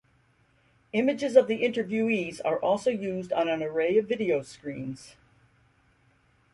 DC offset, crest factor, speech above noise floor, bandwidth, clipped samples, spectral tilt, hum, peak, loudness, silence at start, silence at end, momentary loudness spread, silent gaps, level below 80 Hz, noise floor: under 0.1%; 22 dB; 39 dB; 11.5 kHz; under 0.1%; -6 dB/octave; none; -6 dBFS; -27 LUFS; 0.95 s; 1.45 s; 14 LU; none; -68 dBFS; -65 dBFS